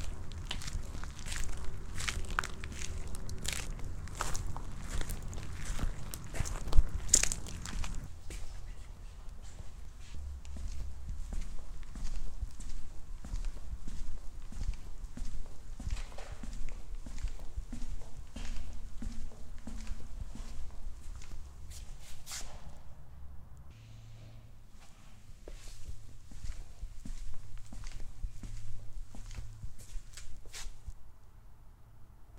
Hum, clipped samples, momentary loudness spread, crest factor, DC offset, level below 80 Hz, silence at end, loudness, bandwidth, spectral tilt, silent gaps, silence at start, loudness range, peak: none; under 0.1%; 16 LU; 32 dB; under 0.1%; -40 dBFS; 0 s; -42 LUFS; 15 kHz; -2.5 dB/octave; none; 0 s; 16 LU; -2 dBFS